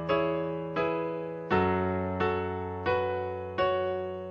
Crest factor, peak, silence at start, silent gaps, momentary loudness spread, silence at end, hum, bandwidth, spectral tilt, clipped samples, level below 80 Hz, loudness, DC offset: 16 dB; -14 dBFS; 0 s; none; 6 LU; 0 s; none; 7 kHz; -8.5 dB/octave; under 0.1%; -58 dBFS; -30 LUFS; under 0.1%